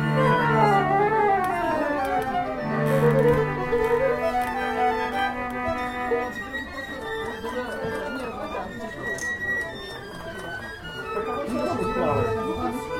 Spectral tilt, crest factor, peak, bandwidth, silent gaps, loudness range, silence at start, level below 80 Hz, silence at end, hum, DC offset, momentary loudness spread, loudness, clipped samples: -6 dB/octave; 18 dB; -6 dBFS; 16.5 kHz; none; 8 LU; 0 s; -46 dBFS; 0 s; none; under 0.1%; 13 LU; -25 LUFS; under 0.1%